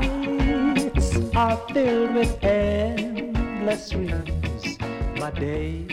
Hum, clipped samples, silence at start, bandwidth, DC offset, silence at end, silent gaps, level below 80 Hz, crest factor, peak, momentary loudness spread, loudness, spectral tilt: none; under 0.1%; 0 s; 14 kHz; under 0.1%; 0 s; none; -30 dBFS; 16 dB; -8 dBFS; 7 LU; -24 LUFS; -6.5 dB/octave